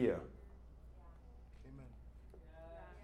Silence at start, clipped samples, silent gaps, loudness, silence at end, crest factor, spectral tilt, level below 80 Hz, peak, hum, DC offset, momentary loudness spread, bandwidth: 0 s; under 0.1%; none; -51 LUFS; 0 s; 22 dB; -8.5 dB/octave; -58 dBFS; -22 dBFS; none; under 0.1%; 12 LU; 11.5 kHz